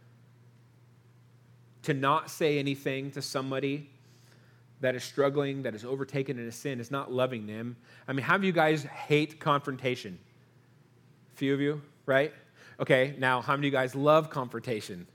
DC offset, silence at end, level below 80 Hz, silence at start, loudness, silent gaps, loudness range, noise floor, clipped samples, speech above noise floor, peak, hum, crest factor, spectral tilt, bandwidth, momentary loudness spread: under 0.1%; 0.1 s; -80 dBFS; 1.85 s; -30 LUFS; none; 5 LU; -61 dBFS; under 0.1%; 31 dB; -8 dBFS; none; 22 dB; -5.5 dB/octave; 18 kHz; 11 LU